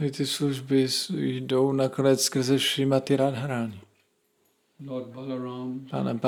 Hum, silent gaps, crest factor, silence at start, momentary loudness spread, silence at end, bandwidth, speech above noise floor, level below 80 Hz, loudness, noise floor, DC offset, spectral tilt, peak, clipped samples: none; none; 18 dB; 0 s; 12 LU; 0 s; 18 kHz; 44 dB; -66 dBFS; -26 LUFS; -69 dBFS; under 0.1%; -5 dB/octave; -8 dBFS; under 0.1%